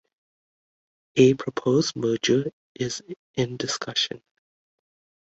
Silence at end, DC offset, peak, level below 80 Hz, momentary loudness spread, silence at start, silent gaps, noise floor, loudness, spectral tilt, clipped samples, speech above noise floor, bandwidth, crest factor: 1.1 s; under 0.1%; -4 dBFS; -62 dBFS; 14 LU; 1.15 s; 2.53-2.75 s, 3.17-3.34 s; under -90 dBFS; -24 LUFS; -4.5 dB/octave; under 0.1%; over 66 dB; 8.2 kHz; 22 dB